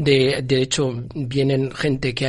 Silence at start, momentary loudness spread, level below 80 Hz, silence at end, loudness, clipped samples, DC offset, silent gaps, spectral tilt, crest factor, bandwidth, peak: 0 s; 7 LU; -46 dBFS; 0 s; -20 LUFS; under 0.1%; under 0.1%; none; -5 dB/octave; 16 dB; 11.5 kHz; -4 dBFS